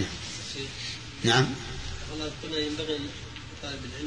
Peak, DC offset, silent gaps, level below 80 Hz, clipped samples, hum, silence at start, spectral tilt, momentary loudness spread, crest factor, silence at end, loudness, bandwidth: -10 dBFS; 0.2%; none; -46 dBFS; under 0.1%; none; 0 s; -4 dB/octave; 14 LU; 22 dB; 0 s; -31 LUFS; 10.5 kHz